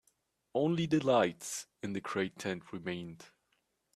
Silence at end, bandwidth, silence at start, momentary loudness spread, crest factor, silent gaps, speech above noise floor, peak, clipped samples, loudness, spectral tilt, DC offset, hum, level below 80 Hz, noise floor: 0.7 s; 14 kHz; 0.55 s; 12 LU; 20 dB; none; 45 dB; -14 dBFS; under 0.1%; -34 LUFS; -5 dB/octave; under 0.1%; none; -72 dBFS; -79 dBFS